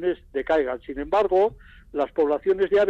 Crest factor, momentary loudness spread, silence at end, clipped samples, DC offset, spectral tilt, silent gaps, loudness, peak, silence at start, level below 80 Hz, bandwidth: 10 dB; 9 LU; 0 s; under 0.1%; under 0.1%; -6.5 dB/octave; none; -24 LUFS; -12 dBFS; 0 s; -48 dBFS; 7.4 kHz